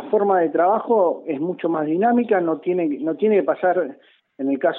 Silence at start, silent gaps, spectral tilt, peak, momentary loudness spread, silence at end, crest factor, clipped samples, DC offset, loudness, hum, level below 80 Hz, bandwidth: 0 s; none; -10.5 dB/octave; -6 dBFS; 7 LU; 0 s; 14 dB; under 0.1%; under 0.1%; -20 LUFS; none; -76 dBFS; 3.9 kHz